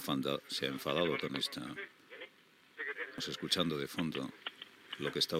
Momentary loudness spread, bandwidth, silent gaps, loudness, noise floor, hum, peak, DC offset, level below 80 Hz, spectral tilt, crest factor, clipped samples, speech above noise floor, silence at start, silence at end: 18 LU; 16 kHz; none; -37 LUFS; -65 dBFS; none; -16 dBFS; under 0.1%; -74 dBFS; -4 dB/octave; 22 dB; under 0.1%; 28 dB; 0 s; 0 s